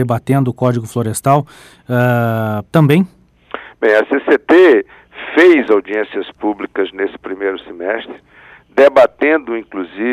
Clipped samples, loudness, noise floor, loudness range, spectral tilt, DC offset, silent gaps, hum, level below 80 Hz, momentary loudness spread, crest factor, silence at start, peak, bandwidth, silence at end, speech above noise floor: under 0.1%; -14 LUFS; -32 dBFS; 4 LU; -7 dB/octave; under 0.1%; none; none; -54 dBFS; 14 LU; 14 dB; 0 s; 0 dBFS; 14.5 kHz; 0 s; 19 dB